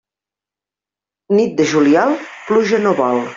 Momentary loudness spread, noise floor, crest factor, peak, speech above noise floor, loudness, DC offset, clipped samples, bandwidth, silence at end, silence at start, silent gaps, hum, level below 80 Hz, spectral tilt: 6 LU; -88 dBFS; 14 dB; -2 dBFS; 74 dB; -15 LUFS; under 0.1%; under 0.1%; 7.6 kHz; 0 s; 1.3 s; none; none; -60 dBFS; -5.5 dB/octave